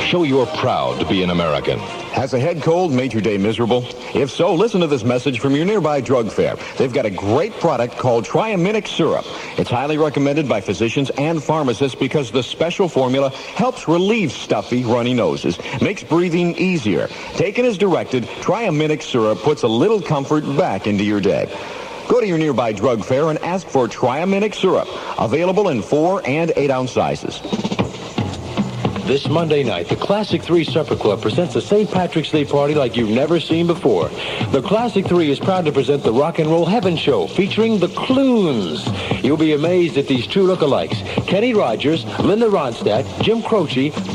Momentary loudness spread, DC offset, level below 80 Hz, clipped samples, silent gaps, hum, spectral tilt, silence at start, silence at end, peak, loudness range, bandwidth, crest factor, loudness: 5 LU; under 0.1%; -50 dBFS; under 0.1%; none; none; -6 dB/octave; 0 s; 0 s; -2 dBFS; 2 LU; 11.5 kHz; 14 dB; -18 LUFS